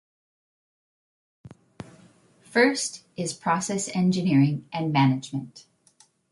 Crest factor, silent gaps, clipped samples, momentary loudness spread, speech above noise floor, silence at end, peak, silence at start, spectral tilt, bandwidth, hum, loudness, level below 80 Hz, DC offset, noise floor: 18 dB; none; under 0.1%; 23 LU; 37 dB; 0.7 s; -8 dBFS; 1.45 s; -5 dB/octave; 11.5 kHz; none; -24 LUFS; -66 dBFS; under 0.1%; -61 dBFS